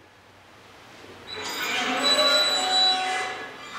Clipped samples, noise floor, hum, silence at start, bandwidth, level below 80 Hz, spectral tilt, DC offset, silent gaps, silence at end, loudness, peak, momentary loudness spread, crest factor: under 0.1%; -52 dBFS; none; 0.75 s; 16 kHz; -68 dBFS; 0 dB/octave; under 0.1%; none; 0 s; -21 LUFS; -10 dBFS; 17 LU; 16 dB